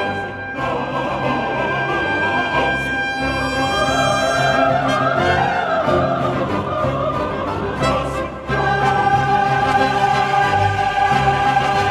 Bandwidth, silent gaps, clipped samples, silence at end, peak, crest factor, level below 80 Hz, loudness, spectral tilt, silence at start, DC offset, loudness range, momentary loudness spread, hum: 14 kHz; none; under 0.1%; 0 s; -4 dBFS; 14 dB; -38 dBFS; -18 LUFS; -5 dB/octave; 0 s; under 0.1%; 3 LU; 6 LU; none